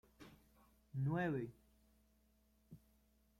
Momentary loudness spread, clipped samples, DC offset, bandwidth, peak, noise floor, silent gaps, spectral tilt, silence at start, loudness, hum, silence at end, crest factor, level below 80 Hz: 25 LU; under 0.1%; under 0.1%; 14.5 kHz; -28 dBFS; -75 dBFS; none; -8.5 dB/octave; 0.2 s; -43 LUFS; none; 0.6 s; 18 dB; -72 dBFS